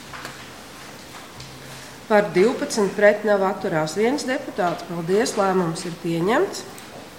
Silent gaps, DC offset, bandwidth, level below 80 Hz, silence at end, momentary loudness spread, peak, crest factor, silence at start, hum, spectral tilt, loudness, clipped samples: none; 0.2%; 17 kHz; -58 dBFS; 0 s; 21 LU; -2 dBFS; 20 dB; 0 s; none; -5 dB/octave; -21 LUFS; under 0.1%